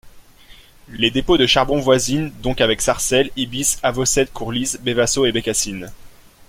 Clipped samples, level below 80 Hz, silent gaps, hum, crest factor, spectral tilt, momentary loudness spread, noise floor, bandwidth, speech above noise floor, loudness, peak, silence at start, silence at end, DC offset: under 0.1%; -38 dBFS; none; none; 18 dB; -3 dB/octave; 7 LU; -45 dBFS; 16.5 kHz; 27 dB; -18 LUFS; -2 dBFS; 0.05 s; 0.05 s; under 0.1%